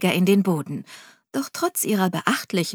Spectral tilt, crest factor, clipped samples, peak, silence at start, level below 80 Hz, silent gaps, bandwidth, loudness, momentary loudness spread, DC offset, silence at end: -5 dB/octave; 20 dB; under 0.1%; -2 dBFS; 0 s; -74 dBFS; none; 19.5 kHz; -22 LUFS; 14 LU; under 0.1%; 0 s